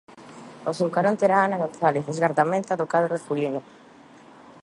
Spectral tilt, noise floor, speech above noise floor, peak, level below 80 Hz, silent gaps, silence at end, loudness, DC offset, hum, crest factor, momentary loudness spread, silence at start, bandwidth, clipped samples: -6.5 dB/octave; -49 dBFS; 26 dB; -6 dBFS; -72 dBFS; none; 0.1 s; -24 LUFS; under 0.1%; none; 18 dB; 12 LU; 0.15 s; 11.5 kHz; under 0.1%